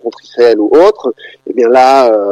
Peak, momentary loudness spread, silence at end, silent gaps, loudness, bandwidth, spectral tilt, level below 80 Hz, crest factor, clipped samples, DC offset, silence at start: 0 dBFS; 14 LU; 0 s; none; -8 LUFS; 11 kHz; -4.5 dB/octave; -50 dBFS; 8 dB; 0.2%; under 0.1%; 0.05 s